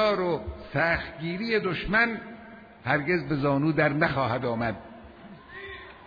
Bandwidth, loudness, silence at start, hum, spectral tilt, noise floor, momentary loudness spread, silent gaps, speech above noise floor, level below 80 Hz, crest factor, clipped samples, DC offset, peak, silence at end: 5 kHz; -26 LUFS; 0 s; none; -8 dB/octave; -47 dBFS; 20 LU; none; 21 dB; -48 dBFS; 18 dB; under 0.1%; under 0.1%; -8 dBFS; 0 s